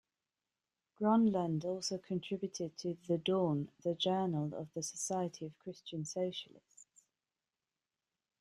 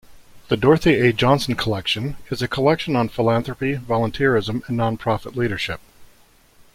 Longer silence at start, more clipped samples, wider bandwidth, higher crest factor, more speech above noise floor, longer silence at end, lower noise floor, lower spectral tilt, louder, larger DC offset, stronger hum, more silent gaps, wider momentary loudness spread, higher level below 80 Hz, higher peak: first, 1 s vs 0.1 s; neither; second, 14 kHz vs 16 kHz; about the same, 18 dB vs 18 dB; first, over 54 dB vs 33 dB; first, 1.55 s vs 0.7 s; first, under -90 dBFS vs -53 dBFS; about the same, -5.5 dB/octave vs -6 dB/octave; second, -37 LUFS vs -20 LUFS; neither; neither; neither; first, 12 LU vs 9 LU; second, -78 dBFS vs -44 dBFS; second, -20 dBFS vs -2 dBFS